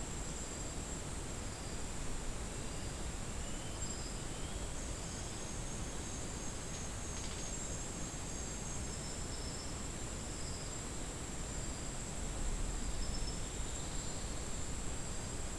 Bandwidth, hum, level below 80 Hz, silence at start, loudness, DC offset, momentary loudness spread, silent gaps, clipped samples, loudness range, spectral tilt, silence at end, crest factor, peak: 12 kHz; none; -46 dBFS; 0 s; -43 LUFS; 0.2%; 2 LU; none; under 0.1%; 1 LU; -3.5 dB/octave; 0 s; 14 dB; -26 dBFS